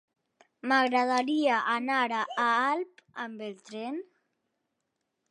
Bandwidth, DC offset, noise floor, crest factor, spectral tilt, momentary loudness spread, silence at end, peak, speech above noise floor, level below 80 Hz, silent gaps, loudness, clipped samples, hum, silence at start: 11 kHz; under 0.1%; -82 dBFS; 18 dB; -3 dB/octave; 15 LU; 1.3 s; -12 dBFS; 53 dB; -88 dBFS; none; -28 LUFS; under 0.1%; none; 0.65 s